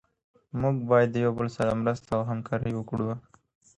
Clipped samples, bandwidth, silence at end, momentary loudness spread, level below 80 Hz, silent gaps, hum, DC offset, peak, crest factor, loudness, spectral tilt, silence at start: under 0.1%; 11 kHz; 0.55 s; 9 LU; -54 dBFS; none; none; under 0.1%; -10 dBFS; 18 dB; -28 LUFS; -8 dB/octave; 0.55 s